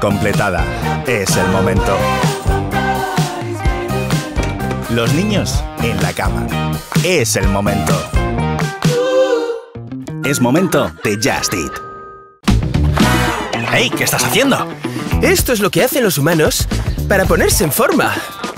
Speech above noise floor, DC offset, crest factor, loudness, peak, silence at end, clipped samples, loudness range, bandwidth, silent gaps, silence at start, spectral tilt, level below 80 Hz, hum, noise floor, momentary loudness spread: 21 dB; under 0.1%; 14 dB; -15 LUFS; 0 dBFS; 0 s; under 0.1%; 4 LU; 16.5 kHz; none; 0 s; -4.5 dB/octave; -26 dBFS; none; -35 dBFS; 7 LU